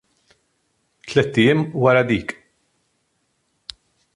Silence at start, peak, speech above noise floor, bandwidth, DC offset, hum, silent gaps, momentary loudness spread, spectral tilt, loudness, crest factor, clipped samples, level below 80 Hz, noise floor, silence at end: 1.05 s; -2 dBFS; 52 dB; 11.5 kHz; under 0.1%; none; none; 22 LU; -6.5 dB/octave; -18 LUFS; 20 dB; under 0.1%; -54 dBFS; -69 dBFS; 1.85 s